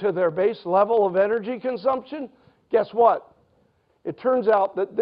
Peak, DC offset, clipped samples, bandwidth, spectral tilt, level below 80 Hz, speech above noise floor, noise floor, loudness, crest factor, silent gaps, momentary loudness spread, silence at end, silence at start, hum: -6 dBFS; under 0.1%; under 0.1%; 5.4 kHz; -9.5 dB/octave; -68 dBFS; 43 dB; -64 dBFS; -22 LUFS; 16 dB; none; 16 LU; 0 s; 0 s; none